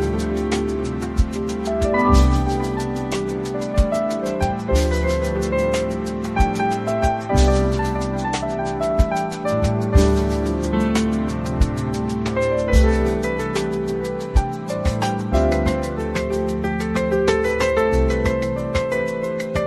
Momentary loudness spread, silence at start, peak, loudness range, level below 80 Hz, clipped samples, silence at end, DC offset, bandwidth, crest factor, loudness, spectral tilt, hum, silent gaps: 7 LU; 0 s; -2 dBFS; 2 LU; -24 dBFS; under 0.1%; 0 s; under 0.1%; 13.5 kHz; 18 dB; -21 LUFS; -6.5 dB/octave; none; none